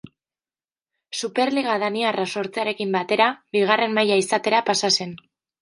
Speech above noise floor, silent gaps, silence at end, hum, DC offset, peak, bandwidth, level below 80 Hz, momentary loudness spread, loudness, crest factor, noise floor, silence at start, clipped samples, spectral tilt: over 69 dB; none; 0.45 s; none; under 0.1%; -2 dBFS; 11.5 kHz; -72 dBFS; 7 LU; -21 LUFS; 22 dB; under -90 dBFS; 0.05 s; under 0.1%; -3 dB/octave